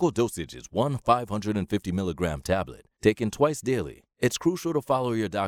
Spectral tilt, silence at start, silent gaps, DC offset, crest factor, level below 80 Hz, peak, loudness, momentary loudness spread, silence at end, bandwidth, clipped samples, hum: -6 dB/octave; 0 s; none; under 0.1%; 20 dB; -50 dBFS; -6 dBFS; -27 LUFS; 6 LU; 0 s; 17 kHz; under 0.1%; none